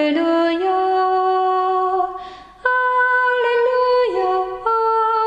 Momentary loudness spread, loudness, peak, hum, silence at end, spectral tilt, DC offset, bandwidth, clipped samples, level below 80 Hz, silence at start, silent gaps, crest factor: 5 LU; -17 LUFS; -4 dBFS; none; 0 s; -4.5 dB/octave; under 0.1%; 8.6 kHz; under 0.1%; -56 dBFS; 0 s; none; 14 dB